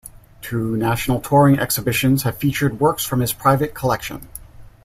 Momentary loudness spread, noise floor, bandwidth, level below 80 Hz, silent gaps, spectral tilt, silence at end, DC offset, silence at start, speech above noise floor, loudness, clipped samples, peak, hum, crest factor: 15 LU; -39 dBFS; 16 kHz; -42 dBFS; none; -5.5 dB/octave; 0.15 s; under 0.1%; 0.05 s; 21 dB; -19 LUFS; under 0.1%; -2 dBFS; none; 16 dB